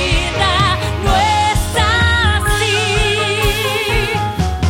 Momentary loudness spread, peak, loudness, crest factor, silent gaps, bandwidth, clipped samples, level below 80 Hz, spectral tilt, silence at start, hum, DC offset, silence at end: 3 LU; -2 dBFS; -14 LUFS; 14 dB; none; 17 kHz; under 0.1%; -22 dBFS; -4 dB/octave; 0 s; none; under 0.1%; 0 s